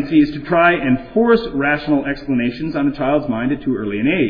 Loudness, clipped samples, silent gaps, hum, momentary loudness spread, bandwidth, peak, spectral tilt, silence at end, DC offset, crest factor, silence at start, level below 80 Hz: -17 LUFS; under 0.1%; none; none; 7 LU; 5.2 kHz; -2 dBFS; -9 dB/octave; 0 s; under 0.1%; 14 dB; 0 s; -40 dBFS